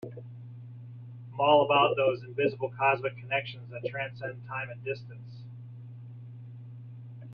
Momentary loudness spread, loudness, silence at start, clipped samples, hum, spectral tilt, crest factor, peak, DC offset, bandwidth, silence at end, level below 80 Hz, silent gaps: 22 LU; -29 LUFS; 0.05 s; under 0.1%; none; -8 dB/octave; 22 dB; -8 dBFS; under 0.1%; 5.4 kHz; 0 s; -72 dBFS; none